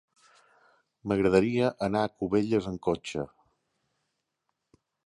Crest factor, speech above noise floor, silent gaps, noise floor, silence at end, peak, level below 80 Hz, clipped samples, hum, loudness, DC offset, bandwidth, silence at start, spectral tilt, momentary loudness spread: 20 dB; 55 dB; none; -81 dBFS; 1.8 s; -10 dBFS; -56 dBFS; under 0.1%; none; -28 LUFS; under 0.1%; 11.5 kHz; 1.05 s; -7 dB/octave; 13 LU